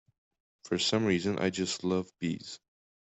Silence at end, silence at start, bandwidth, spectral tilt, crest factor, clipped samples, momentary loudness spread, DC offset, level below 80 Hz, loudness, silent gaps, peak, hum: 0.45 s; 0.65 s; 8.4 kHz; -4.5 dB/octave; 18 dB; under 0.1%; 12 LU; under 0.1%; -68 dBFS; -31 LUFS; none; -14 dBFS; none